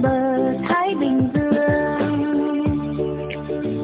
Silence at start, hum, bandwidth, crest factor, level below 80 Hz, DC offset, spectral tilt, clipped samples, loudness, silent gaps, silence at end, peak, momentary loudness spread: 0 s; none; 4 kHz; 14 dB; -42 dBFS; under 0.1%; -11.5 dB/octave; under 0.1%; -21 LUFS; none; 0 s; -6 dBFS; 7 LU